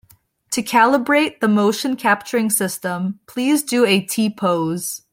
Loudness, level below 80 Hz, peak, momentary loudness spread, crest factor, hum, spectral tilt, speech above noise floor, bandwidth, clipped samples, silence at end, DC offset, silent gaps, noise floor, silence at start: -18 LUFS; -64 dBFS; -2 dBFS; 9 LU; 16 dB; none; -4 dB/octave; 36 dB; 16.5 kHz; under 0.1%; 0.15 s; under 0.1%; none; -55 dBFS; 0.5 s